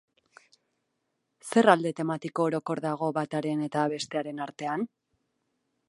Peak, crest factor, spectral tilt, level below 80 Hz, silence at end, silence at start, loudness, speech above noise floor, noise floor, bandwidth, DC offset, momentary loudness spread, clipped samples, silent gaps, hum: -4 dBFS; 26 dB; -5.5 dB/octave; -78 dBFS; 1.05 s; 1.45 s; -28 LUFS; 52 dB; -79 dBFS; 11.5 kHz; under 0.1%; 12 LU; under 0.1%; none; none